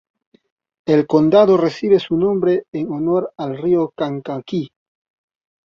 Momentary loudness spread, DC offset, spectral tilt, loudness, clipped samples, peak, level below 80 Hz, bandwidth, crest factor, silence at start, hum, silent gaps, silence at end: 13 LU; under 0.1%; -8 dB/octave; -17 LUFS; under 0.1%; -2 dBFS; -58 dBFS; 7 kHz; 16 dB; 0.85 s; none; 2.68-2.72 s; 1 s